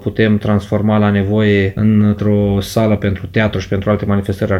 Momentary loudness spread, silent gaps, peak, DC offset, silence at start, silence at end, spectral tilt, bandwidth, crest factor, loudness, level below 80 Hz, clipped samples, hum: 4 LU; none; 0 dBFS; under 0.1%; 0 s; 0 s; -7.5 dB/octave; 14 kHz; 14 dB; -14 LUFS; -38 dBFS; under 0.1%; none